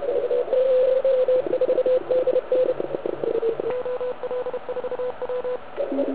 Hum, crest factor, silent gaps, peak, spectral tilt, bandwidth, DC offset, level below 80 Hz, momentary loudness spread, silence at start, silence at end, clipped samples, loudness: none; 12 dB; none; -10 dBFS; -9.5 dB/octave; 4 kHz; 1%; -62 dBFS; 9 LU; 0 s; 0 s; under 0.1%; -23 LUFS